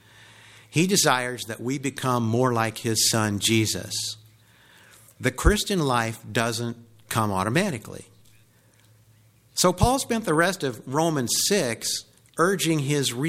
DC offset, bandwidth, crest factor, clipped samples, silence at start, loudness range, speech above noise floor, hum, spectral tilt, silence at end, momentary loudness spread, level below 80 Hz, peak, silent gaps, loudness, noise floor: under 0.1%; 16.5 kHz; 22 dB; under 0.1%; 0.7 s; 4 LU; 34 dB; none; -4 dB/octave; 0 s; 10 LU; -40 dBFS; -4 dBFS; none; -24 LUFS; -58 dBFS